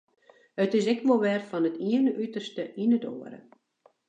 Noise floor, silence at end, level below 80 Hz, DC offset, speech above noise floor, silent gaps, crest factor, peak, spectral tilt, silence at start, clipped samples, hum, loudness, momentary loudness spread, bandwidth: -65 dBFS; 0.7 s; -84 dBFS; under 0.1%; 38 dB; none; 18 dB; -10 dBFS; -6.5 dB/octave; 0.55 s; under 0.1%; none; -27 LUFS; 14 LU; 8.2 kHz